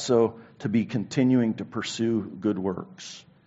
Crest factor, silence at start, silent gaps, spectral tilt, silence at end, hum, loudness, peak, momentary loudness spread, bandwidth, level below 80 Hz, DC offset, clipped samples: 16 dB; 0 s; none; -6 dB/octave; 0.25 s; none; -26 LUFS; -10 dBFS; 14 LU; 8 kHz; -66 dBFS; under 0.1%; under 0.1%